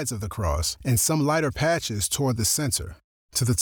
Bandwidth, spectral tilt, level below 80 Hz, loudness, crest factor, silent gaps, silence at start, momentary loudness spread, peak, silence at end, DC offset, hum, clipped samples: over 20 kHz; -4 dB/octave; -40 dBFS; -24 LUFS; 14 dB; 3.04-3.29 s; 0 s; 7 LU; -12 dBFS; 0 s; under 0.1%; none; under 0.1%